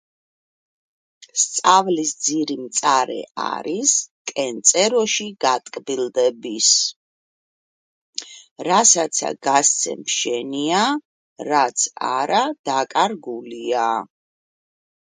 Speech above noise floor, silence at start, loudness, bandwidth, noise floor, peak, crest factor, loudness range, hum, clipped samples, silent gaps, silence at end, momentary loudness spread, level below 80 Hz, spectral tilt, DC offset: over 70 dB; 1.35 s; -19 LUFS; 10 kHz; under -90 dBFS; 0 dBFS; 22 dB; 3 LU; none; under 0.1%; 3.31-3.35 s, 4.11-4.25 s, 6.96-8.13 s, 8.51-8.56 s, 11.05-11.36 s, 12.59-12.64 s; 1 s; 13 LU; -74 dBFS; -1 dB/octave; under 0.1%